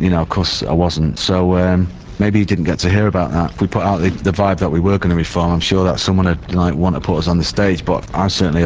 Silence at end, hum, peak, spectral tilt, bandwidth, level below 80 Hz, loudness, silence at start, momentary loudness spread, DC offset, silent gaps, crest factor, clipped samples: 0 s; none; 0 dBFS; -6.5 dB/octave; 8 kHz; -28 dBFS; -16 LUFS; 0 s; 3 LU; under 0.1%; none; 14 dB; under 0.1%